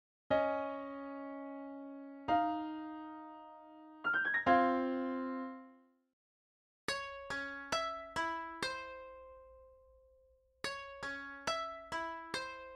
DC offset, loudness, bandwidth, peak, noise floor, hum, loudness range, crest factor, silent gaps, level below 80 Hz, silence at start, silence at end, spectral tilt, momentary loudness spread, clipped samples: under 0.1%; -38 LUFS; 13.5 kHz; -16 dBFS; -70 dBFS; none; 8 LU; 24 dB; 6.13-6.88 s; -70 dBFS; 0.3 s; 0 s; -3.5 dB/octave; 18 LU; under 0.1%